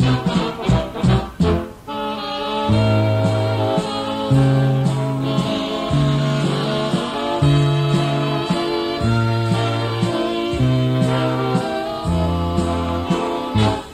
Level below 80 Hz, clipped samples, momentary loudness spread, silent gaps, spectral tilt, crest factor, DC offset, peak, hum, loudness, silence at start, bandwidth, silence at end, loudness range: -36 dBFS; under 0.1%; 5 LU; none; -7 dB/octave; 14 dB; under 0.1%; -4 dBFS; none; -19 LUFS; 0 s; 12.5 kHz; 0 s; 1 LU